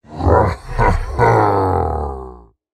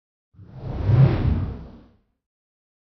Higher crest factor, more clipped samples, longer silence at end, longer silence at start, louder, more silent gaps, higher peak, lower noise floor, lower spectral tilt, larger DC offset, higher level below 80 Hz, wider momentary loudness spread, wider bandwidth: about the same, 16 dB vs 18 dB; neither; second, 0.35 s vs 1.1 s; second, 0.1 s vs 0.4 s; first, -16 LUFS vs -21 LUFS; neither; first, 0 dBFS vs -4 dBFS; second, -38 dBFS vs -53 dBFS; second, -8 dB/octave vs -10.5 dB/octave; neither; first, -26 dBFS vs -34 dBFS; second, 13 LU vs 20 LU; first, 12.5 kHz vs 5.4 kHz